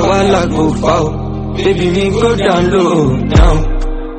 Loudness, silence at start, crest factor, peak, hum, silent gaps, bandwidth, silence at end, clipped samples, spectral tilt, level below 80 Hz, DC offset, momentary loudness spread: -12 LUFS; 0 s; 12 dB; 0 dBFS; none; none; 8.8 kHz; 0 s; under 0.1%; -6.5 dB/octave; -18 dBFS; under 0.1%; 8 LU